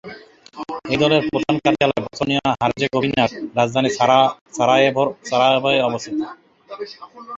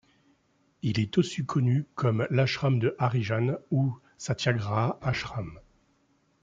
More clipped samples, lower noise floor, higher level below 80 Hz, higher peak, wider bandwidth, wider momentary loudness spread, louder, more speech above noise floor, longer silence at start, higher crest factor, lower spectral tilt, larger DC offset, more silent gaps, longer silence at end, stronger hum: neither; second, -41 dBFS vs -68 dBFS; first, -54 dBFS vs -60 dBFS; first, -2 dBFS vs -8 dBFS; about the same, 8 kHz vs 7.8 kHz; first, 18 LU vs 8 LU; first, -18 LUFS vs -28 LUFS; second, 22 dB vs 41 dB; second, 0.05 s vs 0.85 s; about the same, 18 dB vs 20 dB; second, -5 dB/octave vs -6.5 dB/octave; neither; first, 4.41-4.46 s vs none; second, 0 s vs 0.8 s; neither